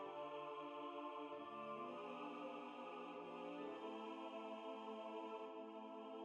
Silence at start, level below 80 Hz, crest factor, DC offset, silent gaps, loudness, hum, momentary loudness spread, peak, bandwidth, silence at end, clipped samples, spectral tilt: 0 s; under -90 dBFS; 12 dB; under 0.1%; none; -52 LUFS; none; 2 LU; -38 dBFS; 10 kHz; 0 s; under 0.1%; -5.5 dB/octave